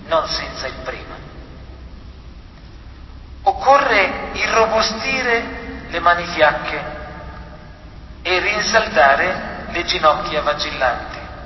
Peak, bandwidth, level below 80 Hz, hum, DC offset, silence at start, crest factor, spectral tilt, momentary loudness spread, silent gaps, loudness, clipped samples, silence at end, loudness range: 0 dBFS; 6.2 kHz; -38 dBFS; none; under 0.1%; 0 s; 18 dB; -3 dB/octave; 22 LU; none; -17 LUFS; under 0.1%; 0 s; 5 LU